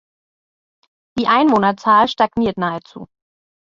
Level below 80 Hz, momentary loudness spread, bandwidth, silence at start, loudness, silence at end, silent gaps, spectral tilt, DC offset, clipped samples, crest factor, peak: -52 dBFS; 11 LU; 7.6 kHz; 1.15 s; -16 LUFS; 0.65 s; none; -6 dB/octave; under 0.1%; under 0.1%; 18 dB; -2 dBFS